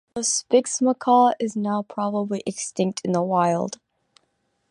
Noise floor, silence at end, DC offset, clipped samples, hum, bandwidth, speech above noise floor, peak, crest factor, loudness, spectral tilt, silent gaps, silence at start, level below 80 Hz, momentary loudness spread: -71 dBFS; 0.95 s; under 0.1%; under 0.1%; none; 11 kHz; 49 dB; -6 dBFS; 18 dB; -22 LUFS; -4.5 dB/octave; none; 0.15 s; -70 dBFS; 10 LU